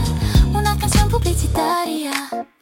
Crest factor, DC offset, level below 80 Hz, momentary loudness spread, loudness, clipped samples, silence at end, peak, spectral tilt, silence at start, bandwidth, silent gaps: 14 dB; under 0.1%; -22 dBFS; 7 LU; -18 LUFS; under 0.1%; 0.15 s; -2 dBFS; -5 dB/octave; 0 s; 17 kHz; none